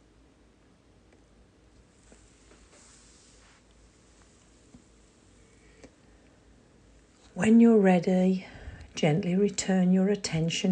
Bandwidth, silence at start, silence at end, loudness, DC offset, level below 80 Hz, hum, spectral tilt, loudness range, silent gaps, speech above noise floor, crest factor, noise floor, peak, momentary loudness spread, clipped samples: 9.6 kHz; 5.85 s; 0 s; -24 LUFS; under 0.1%; -58 dBFS; none; -6 dB/octave; 3 LU; none; 37 dB; 18 dB; -60 dBFS; -10 dBFS; 19 LU; under 0.1%